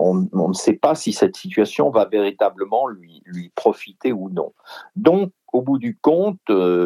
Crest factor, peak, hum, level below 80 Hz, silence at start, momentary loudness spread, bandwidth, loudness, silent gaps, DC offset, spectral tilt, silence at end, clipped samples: 20 dB; 0 dBFS; none; -70 dBFS; 0 s; 10 LU; 14 kHz; -19 LUFS; none; under 0.1%; -6 dB/octave; 0 s; under 0.1%